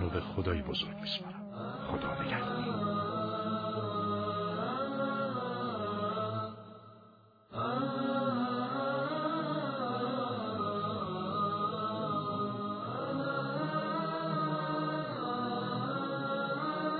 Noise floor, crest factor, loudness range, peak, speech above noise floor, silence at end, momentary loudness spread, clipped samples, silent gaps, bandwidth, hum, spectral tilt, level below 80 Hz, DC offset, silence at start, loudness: -60 dBFS; 16 dB; 2 LU; -18 dBFS; 24 dB; 0 s; 4 LU; under 0.1%; none; 5 kHz; none; -4.5 dB/octave; -58 dBFS; under 0.1%; 0 s; -35 LUFS